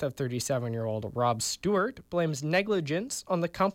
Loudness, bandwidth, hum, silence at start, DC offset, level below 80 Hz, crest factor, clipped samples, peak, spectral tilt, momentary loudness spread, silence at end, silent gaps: -30 LUFS; 17 kHz; none; 0 s; under 0.1%; -60 dBFS; 14 dB; under 0.1%; -14 dBFS; -4.5 dB/octave; 5 LU; 0 s; none